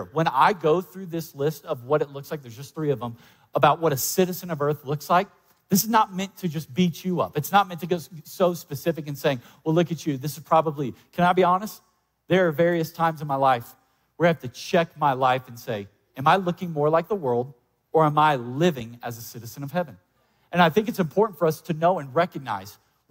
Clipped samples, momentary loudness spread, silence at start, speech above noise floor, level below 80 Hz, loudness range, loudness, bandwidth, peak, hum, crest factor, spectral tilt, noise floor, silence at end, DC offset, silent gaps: under 0.1%; 13 LU; 0 s; 24 dB; -64 dBFS; 2 LU; -24 LUFS; 16 kHz; -4 dBFS; none; 20 dB; -5.5 dB/octave; -48 dBFS; 0.35 s; under 0.1%; none